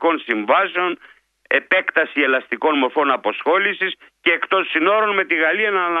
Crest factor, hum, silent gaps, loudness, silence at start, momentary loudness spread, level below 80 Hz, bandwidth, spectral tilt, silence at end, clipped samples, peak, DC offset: 18 dB; none; none; -18 LUFS; 0 s; 5 LU; -72 dBFS; 5 kHz; -5.5 dB/octave; 0 s; under 0.1%; 0 dBFS; under 0.1%